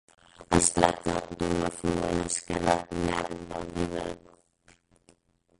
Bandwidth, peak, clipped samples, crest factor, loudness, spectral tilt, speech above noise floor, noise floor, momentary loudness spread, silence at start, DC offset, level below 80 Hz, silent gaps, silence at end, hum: 11.5 kHz; -6 dBFS; under 0.1%; 24 dB; -28 LUFS; -4 dB/octave; 36 dB; -65 dBFS; 12 LU; 0.4 s; under 0.1%; -50 dBFS; none; 1.4 s; none